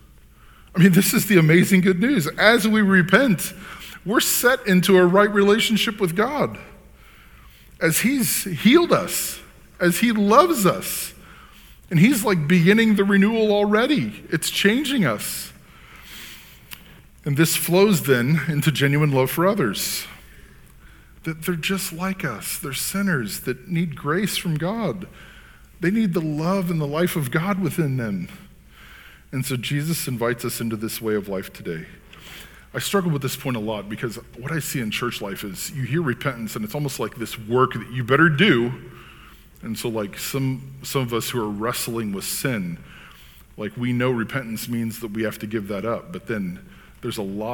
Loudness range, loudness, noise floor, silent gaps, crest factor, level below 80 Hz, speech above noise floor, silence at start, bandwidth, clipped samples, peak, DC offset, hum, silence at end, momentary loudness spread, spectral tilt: 9 LU; -21 LUFS; -48 dBFS; none; 22 dB; -50 dBFS; 28 dB; 0.75 s; 19 kHz; under 0.1%; 0 dBFS; under 0.1%; none; 0 s; 16 LU; -5 dB/octave